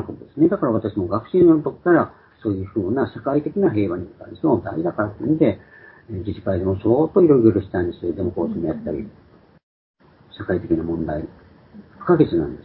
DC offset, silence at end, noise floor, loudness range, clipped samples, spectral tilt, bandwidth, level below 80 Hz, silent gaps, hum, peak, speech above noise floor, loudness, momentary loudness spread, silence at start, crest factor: under 0.1%; 0.05 s; -45 dBFS; 7 LU; under 0.1%; -13 dB/octave; 4.4 kHz; -44 dBFS; 9.63-9.94 s; none; -2 dBFS; 26 dB; -20 LUFS; 14 LU; 0 s; 18 dB